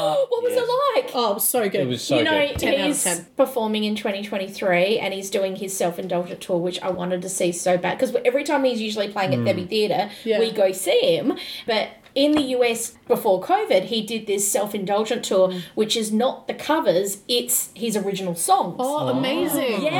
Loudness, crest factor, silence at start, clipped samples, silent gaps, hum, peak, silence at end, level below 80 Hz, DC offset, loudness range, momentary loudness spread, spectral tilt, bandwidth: -22 LUFS; 16 dB; 0 s; under 0.1%; none; none; -6 dBFS; 0 s; -58 dBFS; under 0.1%; 3 LU; 6 LU; -3.5 dB/octave; 19 kHz